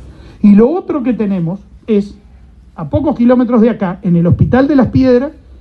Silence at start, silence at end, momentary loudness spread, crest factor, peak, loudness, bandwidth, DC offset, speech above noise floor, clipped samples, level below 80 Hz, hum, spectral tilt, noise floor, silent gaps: 0 s; 0.3 s; 10 LU; 12 dB; 0 dBFS; -12 LUFS; 6 kHz; under 0.1%; 29 dB; under 0.1%; -34 dBFS; none; -10 dB/octave; -39 dBFS; none